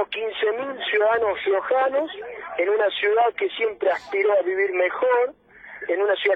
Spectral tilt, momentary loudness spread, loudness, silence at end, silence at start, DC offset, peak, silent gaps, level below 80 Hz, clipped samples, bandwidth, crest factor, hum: -4.5 dB/octave; 7 LU; -22 LUFS; 0 s; 0 s; under 0.1%; -8 dBFS; none; -66 dBFS; under 0.1%; 5.8 kHz; 14 dB; none